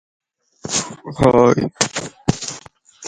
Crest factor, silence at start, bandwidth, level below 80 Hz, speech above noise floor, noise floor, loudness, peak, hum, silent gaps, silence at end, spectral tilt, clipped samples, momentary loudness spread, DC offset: 20 dB; 0.65 s; 11.5 kHz; -44 dBFS; 26 dB; -42 dBFS; -18 LUFS; 0 dBFS; none; none; 0 s; -4.5 dB/octave; under 0.1%; 17 LU; under 0.1%